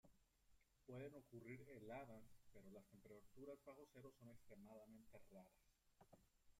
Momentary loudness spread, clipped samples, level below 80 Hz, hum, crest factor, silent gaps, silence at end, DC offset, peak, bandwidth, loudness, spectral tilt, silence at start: 9 LU; under 0.1%; -82 dBFS; none; 18 dB; none; 0 s; under 0.1%; -44 dBFS; 16 kHz; -63 LUFS; -6.5 dB/octave; 0.05 s